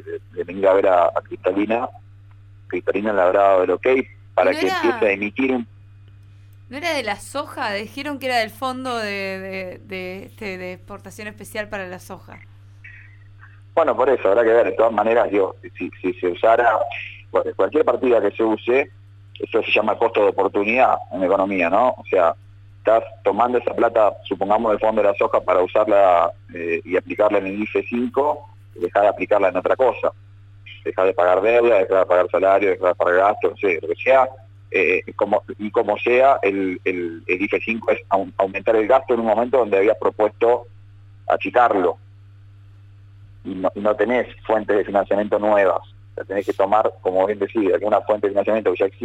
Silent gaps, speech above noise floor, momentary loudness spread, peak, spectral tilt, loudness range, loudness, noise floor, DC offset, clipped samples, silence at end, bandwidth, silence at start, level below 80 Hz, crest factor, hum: none; 26 dB; 14 LU; -4 dBFS; -6 dB/octave; 7 LU; -19 LUFS; -45 dBFS; under 0.1%; under 0.1%; 0 s; 14 kHz; 0.05 s; -56 dBFS; 16 dB; none